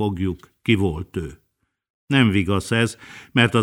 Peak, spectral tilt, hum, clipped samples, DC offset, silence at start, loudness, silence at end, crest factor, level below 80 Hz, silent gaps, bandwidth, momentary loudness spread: -2 dBFS; -6 dB/octave; none; under 0.1%; under 0.1%; 0 s; -21 LUFS; 0 s; 20 dB; -46 dBFS; 1.90-2.07 s; 16 kHz; 13 LU